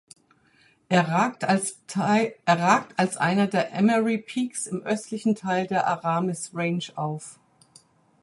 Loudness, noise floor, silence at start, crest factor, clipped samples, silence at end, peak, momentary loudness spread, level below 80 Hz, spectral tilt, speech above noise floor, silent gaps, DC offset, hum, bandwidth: -24 LUFS; -61 dBFS; 0.9 s; 20 dB; under 0.1%; 0.9 s; -4 dBFS; 8 LU; -70 dBFS; -5 dB/octave; 37 dB; none; under 0.1%; none; 11.5 kHz